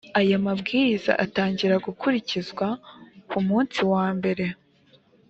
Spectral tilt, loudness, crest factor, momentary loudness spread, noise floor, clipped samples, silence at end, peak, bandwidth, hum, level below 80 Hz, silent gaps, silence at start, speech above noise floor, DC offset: -6.5 dB/octave; -24 LUFS; 20 dB; 8 LU; -59 dBFS; under 0.1%; 0.75 s; -4 dBFS; 7.8 kHz; none; -62 dBFS; none; 0.05 s; 35 dB; under 0.1%